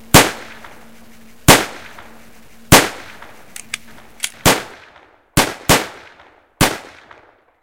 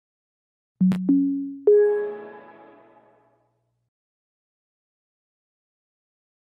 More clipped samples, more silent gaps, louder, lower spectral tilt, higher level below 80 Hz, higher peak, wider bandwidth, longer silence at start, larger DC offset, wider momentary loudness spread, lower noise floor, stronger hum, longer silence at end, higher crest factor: first, 0.3% vs under 0.1%; neither; first, -14 LUFS vs -21 LUFS; second, -3 dB/octave vs -10.5 dB/octave; first, -34 dBFS vs -72 dBFS; first, 0 dBFS vs -8 dBFS; first, 17 kHz vs 4.6 kHz; second, 0.15 s vs 0.8 s; neither; first, 24 LU vs 16 LU; second, -49 dBFS vs -71 dBFS; second, none vs 60 Hz at -70 dBFS; second, 0.8 s vs 4.15 s; about the same, 18 dB vs 20 dB